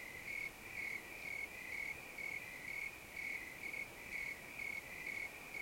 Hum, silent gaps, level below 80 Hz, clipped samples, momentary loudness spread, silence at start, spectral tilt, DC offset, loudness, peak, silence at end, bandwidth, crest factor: none; none; -70 dBFS; under 0.1%; 2 LU; 0 s; -2 dB/octave; under 0.1%; -45 LUFS; -34 dBFS; 0 s; 16.5 kHz; 14 dB